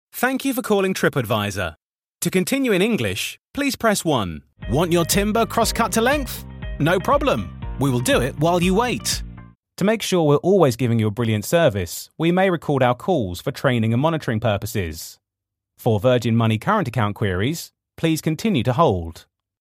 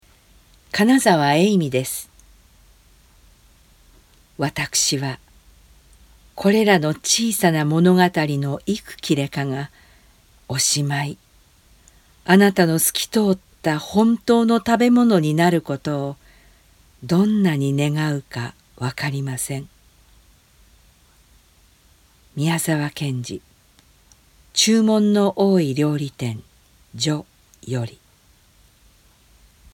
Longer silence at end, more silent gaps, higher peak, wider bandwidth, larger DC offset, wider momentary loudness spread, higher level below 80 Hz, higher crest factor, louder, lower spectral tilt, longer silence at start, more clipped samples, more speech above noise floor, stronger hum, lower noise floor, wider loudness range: second, 0.4 s vs 1.85 s; first, 1.83-1.94 s, 3.39-3.44 s, 9.55-9.63 s vs none; second, -4 dBFS vs 0 dBFS; second, 16.5 kHz vs 18.5 kHz; neither; second, 9 LU vs 14 LU; first, -40 dBFS vs -54 dBFS; about the same, 18 dB vs 22 dB; about the same, -20 LUFS vs -19 LUFS; about the same, -5 dB/octave vs -4.5 dB/octave; second, 0.15 s vs 0.75 s; neither; first, 64 dB vs 37 dB; neither; first, -84 dBFS vs -55 dBFS; second, 3 LU vs 11 LU